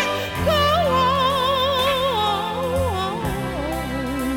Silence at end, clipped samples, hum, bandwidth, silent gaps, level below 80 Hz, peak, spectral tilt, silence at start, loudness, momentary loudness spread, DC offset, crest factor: 0 s; under 0.1%; none; 17 kHz; none; -38 dBFS; -8 dBFS; -4.5 dB/octave; 0 s; -20 LUFS; 8 LU; 0.1%; 14 dB